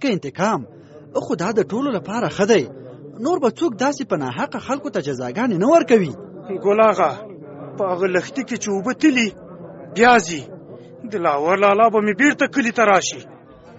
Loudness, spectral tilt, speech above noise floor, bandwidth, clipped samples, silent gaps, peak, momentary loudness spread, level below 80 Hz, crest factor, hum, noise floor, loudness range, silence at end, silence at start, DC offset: -19 LUFS; -4 dB/octave; 21 dB; 8 kHz; under 0.1%; none; 0 dBFS; 20 LU; -60 dBFS; 18 dB; none; -39 dBFS; 4 LU; 0.05 s; 0 s; under 0.1%